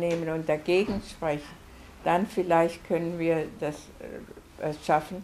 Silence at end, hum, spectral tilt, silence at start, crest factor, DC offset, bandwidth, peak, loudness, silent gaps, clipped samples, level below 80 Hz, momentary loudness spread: 0 s; none; -6 dB/octave; 0 s; 20 dB; under 0.1%; 15 kHz; -10 dBFS; -28 LUFS; none; under 0.1%; -54 dBFS; 17 LU